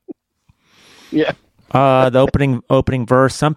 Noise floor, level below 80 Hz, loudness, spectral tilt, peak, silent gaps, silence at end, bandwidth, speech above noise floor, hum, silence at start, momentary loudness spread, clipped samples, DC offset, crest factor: -59 dBFS; -38 dBFS; -15 LUFS; -7 dB/octave; 0 dBFS; none; 0 s; 12 kHz; 45 dB; none; 0.1 s; 9 LU; under 0.1%; under 0.1%; 16 dB